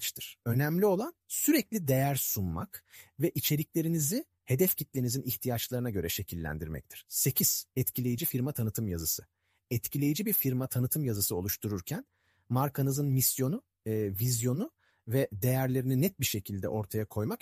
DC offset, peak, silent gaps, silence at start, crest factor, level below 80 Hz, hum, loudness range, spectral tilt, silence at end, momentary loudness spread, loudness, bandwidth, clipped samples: under 0.1%; -14 dBFS; none; 0 s; 18 dB; -56 dBFS; none; 1 LU; -5 dB/octave; 0.05 s; 9 LU; -31 LUFS; 15.5 kHz; under 0.1%